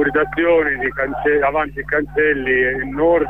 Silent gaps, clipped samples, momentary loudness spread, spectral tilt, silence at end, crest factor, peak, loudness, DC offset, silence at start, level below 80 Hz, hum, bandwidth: none; under 0.1%; 5 LU; -8 dB/octave; 0 s; 12 dB; -6 dBFS; -17 LUFS; 0.3%; 0 s; -38 dBFS; none; 3.9 kHz